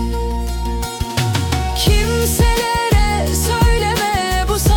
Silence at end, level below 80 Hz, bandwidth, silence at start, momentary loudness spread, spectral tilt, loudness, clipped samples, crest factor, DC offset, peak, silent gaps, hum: 0 s; -20 dBFS; 18 kHz; 0 s; 7 LU; -4.5 dB/octave; -17 LUFS; under 0.1%; 12 dB; under 0.1%; -2 dBFS; none; none